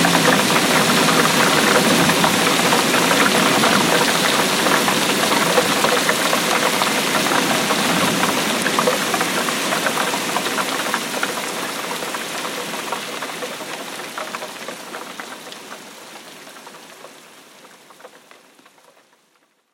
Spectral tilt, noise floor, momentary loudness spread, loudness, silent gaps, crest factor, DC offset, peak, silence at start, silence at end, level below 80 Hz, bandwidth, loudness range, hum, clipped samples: -2.5 dB/octave; -61 dBFS; 17 LU; -17 LUFS; none; 18 dB; under 0.1%; -2 dBFS; 0 s; 1.65 s; -58 dBFS; 17 kHz; 17 LU; none; under 0.1%